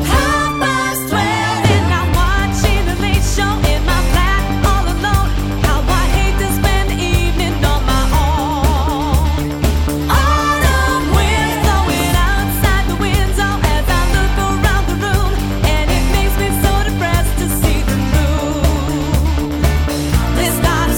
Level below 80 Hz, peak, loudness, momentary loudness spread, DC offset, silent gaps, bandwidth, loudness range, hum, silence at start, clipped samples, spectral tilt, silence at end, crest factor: -16 dBFS; 0 dBFS; -15 LUFS; 3 LU; under 0.1%; none; 19.5 kHz; 1 LU; none; 0 s; under 0.1%; -5 dB/octave; 0 s; 12 dB